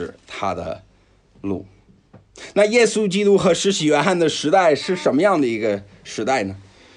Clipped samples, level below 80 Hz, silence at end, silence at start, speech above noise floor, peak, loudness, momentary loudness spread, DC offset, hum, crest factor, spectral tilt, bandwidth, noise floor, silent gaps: under 0.1%; -56 dBFS; 0.35 s; 0 s; 37 dB; -4 dBFS; -19 LUFS; 16 LU; under 0.1%; none; 16 dB; -4.5 dB/octave; 11 kHz; -55 dBFS; none